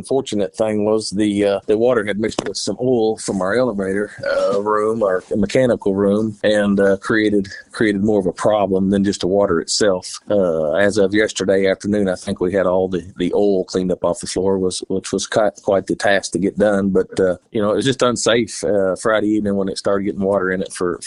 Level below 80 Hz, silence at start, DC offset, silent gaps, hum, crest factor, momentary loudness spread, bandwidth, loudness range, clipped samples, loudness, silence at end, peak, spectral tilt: -48 dBFS; 0 s; under 0.1%; none; none; 16 dB; 5 LU; 11.5 kHz; 2 LU; under 0.1%; -18 LUFS; 0 s; -2 dBFS; -5 dB/octave